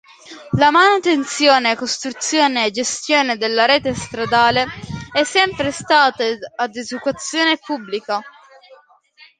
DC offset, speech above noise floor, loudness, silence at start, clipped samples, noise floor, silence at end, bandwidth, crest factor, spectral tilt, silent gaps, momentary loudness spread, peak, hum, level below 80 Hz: under 0.1%; 32 dB; -17 LUFS; 0.25 s; under 0.1%; -49 dBFS; 0.65 s; 9.8 kHz; 18 dB; -3 dB/octave; none; 11 LU; 0 dBFS; none; -50 dBFS